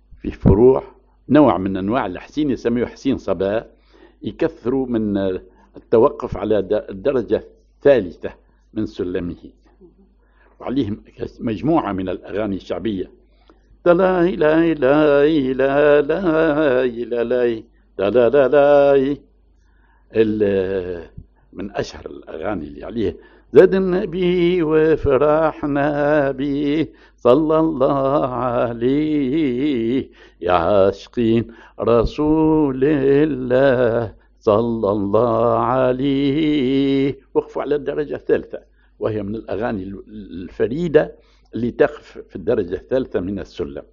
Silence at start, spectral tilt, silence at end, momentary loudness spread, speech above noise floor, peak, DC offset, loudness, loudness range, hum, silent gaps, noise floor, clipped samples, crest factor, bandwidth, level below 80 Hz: 0.25 s; -6 dB/octave; 0.1 s; 14 LU; 36 dB; 0 dBFS; under 0.1%; -18 LUFS; 7 LU; none; none; -54 dBFS; under 0.1%; 18 dB; 7 kHz; -40 dBFS